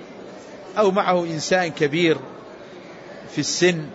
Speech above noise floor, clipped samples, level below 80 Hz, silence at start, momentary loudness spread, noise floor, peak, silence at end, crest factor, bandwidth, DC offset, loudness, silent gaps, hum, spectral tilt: 20 dB; under 0.1%; -64 dBFS; 0 s; 21 LU; -40 dBFS; -6 dBFS; 0 s; 18 dB; 8 kHz; under 0.1%; -21 LUFS; none; none; -4 dB/octave